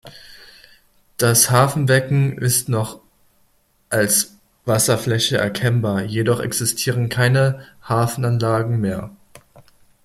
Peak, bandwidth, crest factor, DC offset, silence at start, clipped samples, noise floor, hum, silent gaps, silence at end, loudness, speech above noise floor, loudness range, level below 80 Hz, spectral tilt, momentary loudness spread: 0 dBFS; 15.5 kHz; 18 dB; under 0.1%; 0.05 s; under 0.1%; -60 dBFS; none; none; 0.95 s; -18 LUFS; 42 dB; 2 LU; -52 dBFS; -4 dB/octave; 9 LU